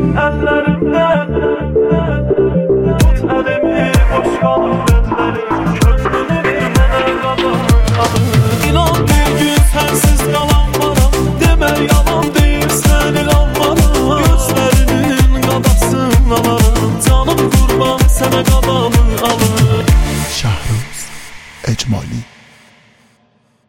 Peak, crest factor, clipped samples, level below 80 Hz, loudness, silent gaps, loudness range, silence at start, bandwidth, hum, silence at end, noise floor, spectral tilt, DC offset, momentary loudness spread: 0 dBFS; 12 dB; under 0.1%; -16 dBFS; -12 LUFS; none; 2 LU; 0 s; 17 kHz; none; 1.45 s; -54 dBFS; -5.5 dB/octave; under 0.1%; 5 LU